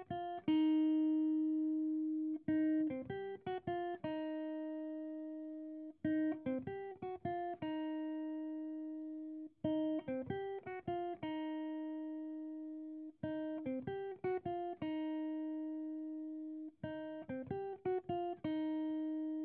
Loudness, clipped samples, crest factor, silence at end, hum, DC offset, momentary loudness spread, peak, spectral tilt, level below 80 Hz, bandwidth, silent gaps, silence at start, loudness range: -41 LUFS; under 0.1%; 16 dB; 0 s; none; under 0.1%; 11 LU; -24 dBFS; -6 dB/octave; -78 dBFS; 3.6 kHz; none; 0 s; 6 LU